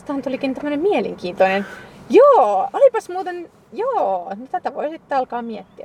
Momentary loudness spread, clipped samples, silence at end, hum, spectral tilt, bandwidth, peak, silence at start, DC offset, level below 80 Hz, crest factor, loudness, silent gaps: 16 LU; under 0.1%; 0 s; none; -6 dB/octave; 10.5 kHz; -2 dBFS; 0.1 s; under 0.1%; -60 dBFS; 18 dB; -18 LUFS; none